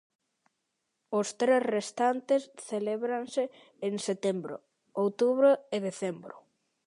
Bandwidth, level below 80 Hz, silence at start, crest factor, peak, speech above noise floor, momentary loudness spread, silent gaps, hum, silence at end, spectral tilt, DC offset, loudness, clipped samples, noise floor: 11 kHz; -84 dBFS; 1.1 s; 18 dB; -12 dBFS; 52 dB; 13 LU; none; none; 0.45 s; -5 dB/octave; under 0.1%; -30 LUFS; under 0.1%; -82 dBFS